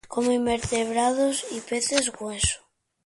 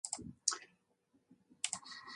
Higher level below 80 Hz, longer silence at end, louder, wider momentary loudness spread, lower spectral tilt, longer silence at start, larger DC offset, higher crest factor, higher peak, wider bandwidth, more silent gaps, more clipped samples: first, -46 dBFS vs -74 dBFS; first, 0.5 s vs 0 s; first, -25 LUFS vs -40 LUFS; about the same, 7 LU vs 8 LU; first, -3 dB/octave vs 0 dB/octave; about the same, 0.05 s vs 0.05 s; neither; second, 18 dB vs 34 dB; first, -6 dBFS vs -10 dBFS; about the same, 11.5 kHz vs 11 kHz; neither; neither